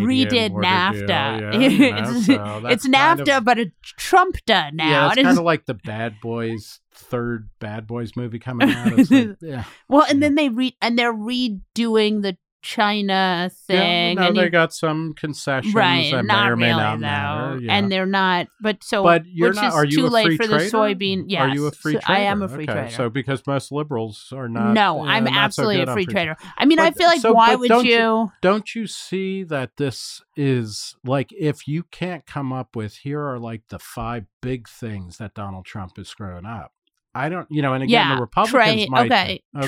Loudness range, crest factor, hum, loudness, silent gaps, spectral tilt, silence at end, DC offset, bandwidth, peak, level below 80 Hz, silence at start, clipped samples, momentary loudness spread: 11 LU; 16 dB; none; -19 LUFS; 12.52-12.60 s, 34.33-34.41 s, 39.45-39.52 s; -5 dB/octave; 0 s; under 0.1%; 16 kHz; -2 dBFS; -52 dBFS; 0 s; under 0.1%; 15 LU